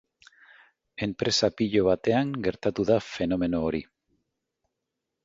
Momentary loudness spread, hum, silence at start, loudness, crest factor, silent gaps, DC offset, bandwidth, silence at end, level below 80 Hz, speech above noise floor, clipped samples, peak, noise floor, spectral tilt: 9 LU; none; 1 s; -26 LUFS; 18 dB; none; under 0.1%; 8 kHz; 1.4 s; -54 dBFS; 58 dB; under 0.1%; -10 dBFS; -84 dBFS; -5 dB/octave